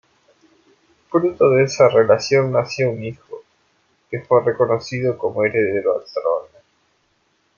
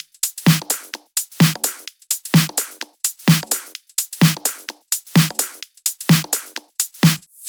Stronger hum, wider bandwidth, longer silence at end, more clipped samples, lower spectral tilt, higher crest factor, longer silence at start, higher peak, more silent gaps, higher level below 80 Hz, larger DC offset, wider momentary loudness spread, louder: neither; second, 7.2 kHz vs over 20 kHz; first, 1.15 s vs 0 s; neither; first, -6 dB/octave vs -4 dB/octave; about the same, 18 dB vs 18 dB; first, 1.1 s vs 0.25 s; about the same, -2 dBFS vs -2 dBFS; neither; about the same, -62 dBFS vs -60 dBFS; neither; first, 17 LU vs 8 LU; about the same, -18 LUFS vs -19 LUFS